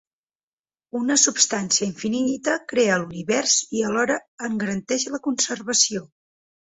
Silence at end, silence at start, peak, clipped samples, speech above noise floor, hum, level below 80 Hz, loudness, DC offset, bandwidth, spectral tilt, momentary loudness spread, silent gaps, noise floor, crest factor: 0.7 s; 0.95 s; -2 dBFS; under 0.1%; over 67 dB; none; -64 dBFS; -21 LUFS; under 0.1%; 8.4 kHz; -2 dB/octave; 9 LU; 4.28-4.38 s; under -90 dBFS; 22 dB